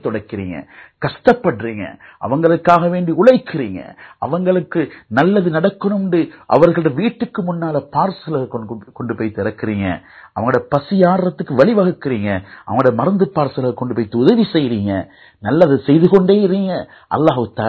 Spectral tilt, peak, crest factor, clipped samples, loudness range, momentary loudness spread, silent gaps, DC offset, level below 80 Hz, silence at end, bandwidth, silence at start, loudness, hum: -9 dB/octave; 0 dBFS; 16 dB; 0.2%; 4 LU; 14 LU; none; under 0.1%; -48 dBFS; 0 s; 7.6 kHz; 0.05 s; -16 LUFS; none